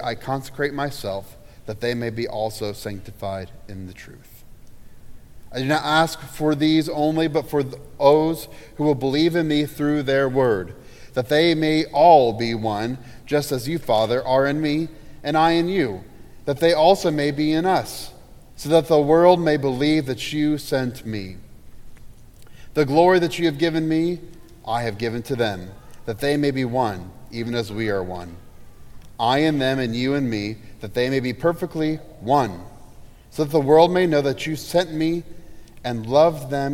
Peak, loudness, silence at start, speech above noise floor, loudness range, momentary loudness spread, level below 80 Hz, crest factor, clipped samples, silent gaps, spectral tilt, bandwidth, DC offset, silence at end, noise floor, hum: -2 dBFS; -21 LUFS; 0 s; 22 dB; 7 LU; 17 LU; -48 dBFS; 20 dB; under 0.1%; none; -6 dB/octave; 16.5 kHz; under 0.1%; 0 s; -42 dBFS; none